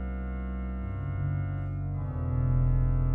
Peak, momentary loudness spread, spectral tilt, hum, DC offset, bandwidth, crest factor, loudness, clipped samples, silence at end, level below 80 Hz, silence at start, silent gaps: -16 dBFS; 9 LU; -12.5 dB/octave; none; under 0.1%; 3 kHz; 12 dB; -31 LUFS; under 0.1%; 0 s; -32 dBFS; 0 s; none